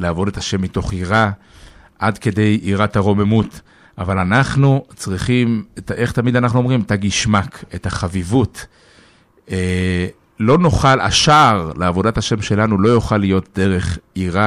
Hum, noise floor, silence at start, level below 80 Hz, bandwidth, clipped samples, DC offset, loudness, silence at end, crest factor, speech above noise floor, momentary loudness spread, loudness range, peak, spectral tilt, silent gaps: none; -50 dBFS; 0 s; -36 dBFS; 13 kHz; under 0.1%; under 0.1%; -16 LUFS; 0 s; 14 dB; 34 dB; 11 LU; 5 LU; -2 dBFS; -5.5 dB/octave; none